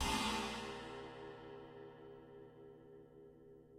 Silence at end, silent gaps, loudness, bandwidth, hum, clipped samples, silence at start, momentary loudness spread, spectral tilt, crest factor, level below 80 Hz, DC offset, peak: 0 s; none; -44 LUFS; 16 kHz; none; under 0.1%; 0 s; 22 LU; -3 dB/octave; 20 dB; -58 dBFS; under 0.1%; -26 dBFS